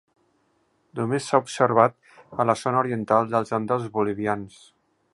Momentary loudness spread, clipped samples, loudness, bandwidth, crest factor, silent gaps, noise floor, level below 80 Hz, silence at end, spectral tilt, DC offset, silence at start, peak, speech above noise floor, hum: 10 LU; under 0.1%; -23 LUFS; 11.5 kHz; 24 dB; none; -67 dBFS; -64 dBFS; 0.65 s; -6 dB/octave; under 0.1%; 0.95 s; -2 dBFS; 44 dB; none